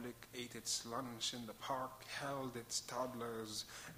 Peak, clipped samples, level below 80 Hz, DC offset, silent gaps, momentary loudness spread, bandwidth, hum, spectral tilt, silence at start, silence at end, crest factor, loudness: -28 dBFS; under 0.1%; -72 dBFS; under 0.1%; none; 6 LU; 15.5 kHz; none; -2.5 dB/octave; 0 s; 0 s; 18 dB; -44 LUFS